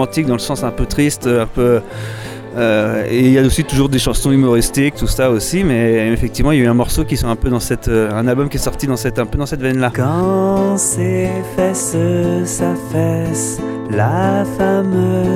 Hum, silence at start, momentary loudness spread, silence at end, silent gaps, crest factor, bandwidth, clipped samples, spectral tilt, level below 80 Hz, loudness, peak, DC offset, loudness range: none; 0 s; 6 LU; 0 s; none; 14 dB; 17.5 kHz; under 0.1%; -5.5 dB/octave; -28 dBFS; -15 LUFS; 0 dBFS; under 0.1%; 3 LU